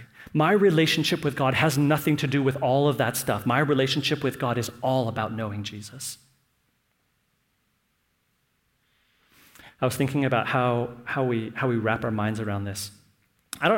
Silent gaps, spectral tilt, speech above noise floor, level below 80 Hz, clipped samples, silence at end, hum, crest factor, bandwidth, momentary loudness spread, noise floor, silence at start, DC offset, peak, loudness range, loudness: none; -5.5 dB/octave; 47 dB; -60 dBFS; under 0.1%; 0 s; none; 20 dB; 17 kHz; 12 LU; -72 dBFS; 0 s; under 0.1%; -6 dBFS; 14 LU; -25 LUFS